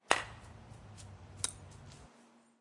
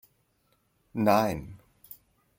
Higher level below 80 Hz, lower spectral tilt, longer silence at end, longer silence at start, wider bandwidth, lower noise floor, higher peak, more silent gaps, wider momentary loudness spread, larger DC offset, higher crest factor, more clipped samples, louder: second, -64 dBFS vs -58 dBFS; second, -1.5 dB/octave vs -6.5 dB/octave; second, 0.2 s vs 0.85 s; second, 0.05 s vs 0.95 s; second, 11.5 kHz vs 17 kHz; second, -64 dBFS vs -71 dBFS; about the same, -6 dBFS vs -8 dBFS; neither; second, 22 LU vs 25 LU; neither; first, 36 dB vs 24 dB; neither; second, -37 LUFS vs -27 LUFS